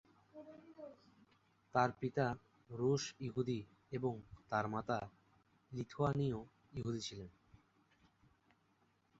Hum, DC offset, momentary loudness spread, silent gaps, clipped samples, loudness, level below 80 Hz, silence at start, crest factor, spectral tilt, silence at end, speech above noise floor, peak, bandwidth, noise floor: none; under 0.1%; 20 LU; none; under 0.1%; -41 LUFS; -68 dBFS; 0.35 s; 24 dB; -6 dB/octave; 1.9 s; 37 dB; -18 dBFS; 8 kHz; -77 dBFS